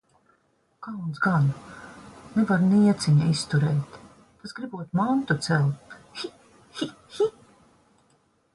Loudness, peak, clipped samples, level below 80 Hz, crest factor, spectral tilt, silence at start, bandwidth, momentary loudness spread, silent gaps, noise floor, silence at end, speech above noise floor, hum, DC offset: -25 LUFS; -10 dBFS; under 0.1%; -60 dBFS; 16 dB; -6.5 dB/octave; 0.8 s; 11.5 kHz; 22 LU; none; -67 dBFS; 1.25 s; 44 dB; none; under 0.1%